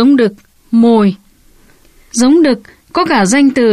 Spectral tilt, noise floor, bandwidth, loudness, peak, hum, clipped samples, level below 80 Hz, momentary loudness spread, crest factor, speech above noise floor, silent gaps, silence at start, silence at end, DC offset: -5 dB/octave; -45 dBFS; 13 kHz; -11 LUFS; -2 dBFS; none; under 0.1%; -48 dBFS; 11 LU; 10 dB; 36 dB; none; 0 s; 0 s; under 0.1%